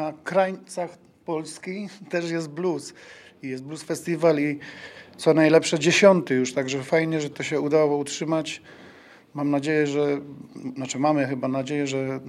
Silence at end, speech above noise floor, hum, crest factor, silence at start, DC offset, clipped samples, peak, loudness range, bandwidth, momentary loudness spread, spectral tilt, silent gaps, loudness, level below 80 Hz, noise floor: 0 s; 25 dB; none; 22 dB; 0 s; under 0.1%; under 0.1%; -2 dBFS; 8 LU; 14 kHz; 17 LU; -5 dB/octave; none; -24 LUFS; -72 dBFS; -49 dBFS